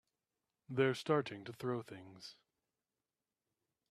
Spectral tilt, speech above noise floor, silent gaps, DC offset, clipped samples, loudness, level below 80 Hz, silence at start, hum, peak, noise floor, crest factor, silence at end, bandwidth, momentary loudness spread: -6 dB/octave; over 51 dB; none; under 0.1%; under 0.1%; -38 LUFS; -82 dBFS; 0.7 s; none; -18 dBFS; under -90 dBFS; 24 dB; 1.6 s; 13.5 kHz; 19 LU